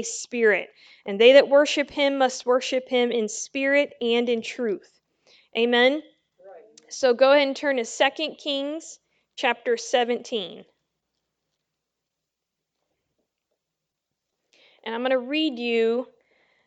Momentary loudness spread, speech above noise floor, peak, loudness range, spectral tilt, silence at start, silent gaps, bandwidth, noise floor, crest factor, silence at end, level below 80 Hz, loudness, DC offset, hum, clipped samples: 16 LU; 61 dB; -2 dBFS; 10 LU; -2.5 dB/octave; 0 s; none; 9.2 kHz; -84 dBFS; 22 dB; 0.6 s; -76 dBFS; -22 LUFS; under 0.1%; none; under 0.1%